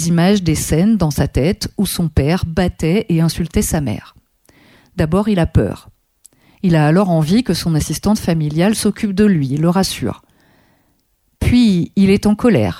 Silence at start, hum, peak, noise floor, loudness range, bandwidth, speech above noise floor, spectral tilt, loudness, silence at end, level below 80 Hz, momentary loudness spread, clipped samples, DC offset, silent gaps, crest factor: 0 s; none; -2 dBFS; -62 dBFS; 3 LU; 16 kHz; 47 dB; -6 dB/octave; -15 LUFS; 0 s; -32 dBFS; 8 LU; under 0.1%; under 0.1%; none; 14 dB